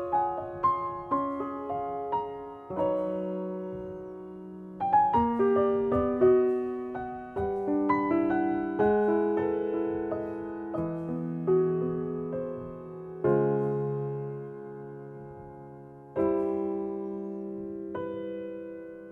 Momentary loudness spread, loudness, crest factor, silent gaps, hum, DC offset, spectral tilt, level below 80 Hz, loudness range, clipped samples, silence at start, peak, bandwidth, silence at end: 17 LU; -29 LUFS; 18 dB; none; none; under 0.1%; -10.5 dB/octave; -58 dBFS; 7 LU; under 0.1%; 0 s; -12 dBFS; 4.3 kHz; 0 s